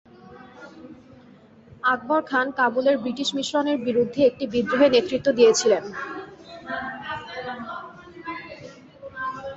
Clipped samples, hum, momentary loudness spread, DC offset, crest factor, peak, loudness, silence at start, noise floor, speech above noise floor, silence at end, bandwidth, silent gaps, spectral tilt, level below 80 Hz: under 0.1%; none; 23 LU; under 0.1%; 20 dB; -4 dBFS; -23 LUFS; 0.3 s; -50 dBFS; 29 dB; 0 s; 8 kHz; none; -3.5 dB/octave; -60 dBFS